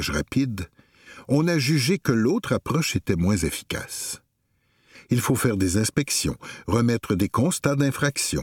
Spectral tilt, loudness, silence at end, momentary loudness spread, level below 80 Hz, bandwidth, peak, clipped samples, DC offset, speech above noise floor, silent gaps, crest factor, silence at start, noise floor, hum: -5 dB/octave; -23 LUFS; 0 s; 9 LU; -46 dBFS; 18.5 kHz; -4 dBFS; under 0.1%; under 0.1%; 46 dB; none; 20 dB; 0 s; -69 dBFS; none